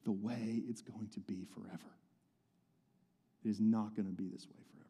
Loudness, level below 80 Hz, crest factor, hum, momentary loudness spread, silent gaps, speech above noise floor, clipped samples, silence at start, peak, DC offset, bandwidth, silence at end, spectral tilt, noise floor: -41 LUFS; -88 dBFS; 18 dB; none; 18 LU; none; 36 dB; under 0.1%; 0.05 s; -24 dBFS; under 0.1%; 11.5 kHz; 0.05 s; -7.5 dB/octave; -77 dBFS